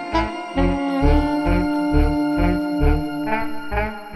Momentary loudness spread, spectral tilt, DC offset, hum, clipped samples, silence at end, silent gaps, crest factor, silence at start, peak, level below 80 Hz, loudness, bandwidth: 6 LU; -7.5 dB/octave; under 0.1%; none; under 0.1%; 0 s; none; 14 dB; 0 s; -4 dBFS; -24 dBFS; -21 LUFS; 12 kHz